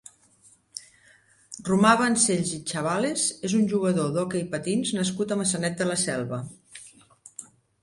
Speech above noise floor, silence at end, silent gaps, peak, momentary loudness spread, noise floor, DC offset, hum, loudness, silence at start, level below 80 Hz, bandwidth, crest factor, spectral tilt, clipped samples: 34 dB; 0.4 s; none; -6 dBFS; 23 LU; -59 dBFS; under 0.1%; none; -24 LUFS; 0.75 s; -64 dBFS; 11.5 kHz; 22 dB; -4 dB/octave; under 0.1%